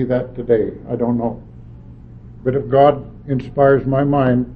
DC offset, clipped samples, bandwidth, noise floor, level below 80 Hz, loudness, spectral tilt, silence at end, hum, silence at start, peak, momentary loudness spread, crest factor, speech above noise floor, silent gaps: under 0.1%; under 0.1%; 4.9 kHz; -38 dBFS; -40 dBFS; -17 LUFS; -11 dB/octave; 0 s; none; 0 s; 0 dBFS; 11 LU; 16 dB; 21 dB; none